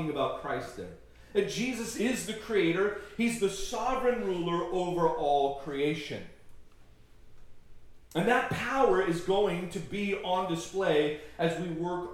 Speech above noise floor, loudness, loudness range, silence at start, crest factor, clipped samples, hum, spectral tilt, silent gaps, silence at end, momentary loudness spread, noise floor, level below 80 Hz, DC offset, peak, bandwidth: 24 dB; -30 LUFS; 4 LU; 0 s; 18 dB; under 0.1%; none; -5 dB/octave; none; 0 s; 9 LU; -54 dBFS; -54 dBFS; under 0.1%; -12 dBFS; 16.5 kHz